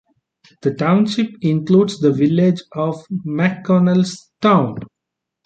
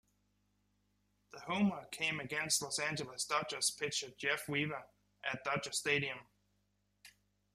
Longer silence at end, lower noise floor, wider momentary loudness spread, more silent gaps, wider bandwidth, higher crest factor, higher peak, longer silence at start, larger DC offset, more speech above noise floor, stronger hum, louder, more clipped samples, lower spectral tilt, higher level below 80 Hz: first, 0.6 s vs 0.45 s; about the same, -81 dBFS vs -79 dBFS; about the same, 9 LU vs 8 LU; neither; second, 9 kHz vs 15 kHz; second, 16 dB vs 22 dB; first, -2 dBFS vs -18 dBFS; second, 0.65 s vs 1.35 s; neither; first, 65 dB vs 41 dB; second, none vs 50 Hz at -65 dBFS; first, -17 LUFS vs -36 LUFS; neither; first, -7.5 dB/octave vs -2.5 dB/octave; first, -58 dBFS vs -76 dBFS